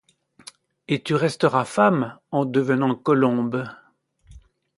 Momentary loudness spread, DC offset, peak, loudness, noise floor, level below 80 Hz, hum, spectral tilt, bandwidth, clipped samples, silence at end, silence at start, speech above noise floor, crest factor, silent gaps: 8 LU; under 0.1%; -4 dBFS; -22 LUFS; -56 dBFS; -60 dBFS; none; -6.5 dB/octave; 11.5 kHz; under 0.1%; 0.4 s; 0.9 s; 35 dB; 20 dB; none